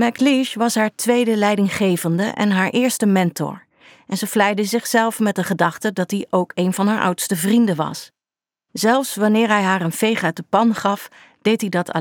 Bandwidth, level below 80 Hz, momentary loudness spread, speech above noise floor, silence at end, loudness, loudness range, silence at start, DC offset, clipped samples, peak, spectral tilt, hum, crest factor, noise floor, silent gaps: 19.5 kHz; -68 dBFS; 7 LU; over 72 dB; 0 s; -19 LUFS; 2 LU; 0 s; under 0.1%; under 0.1%; -2 dBFS; -5 dB/octave; none; 16 dB; under -90 dBFS; none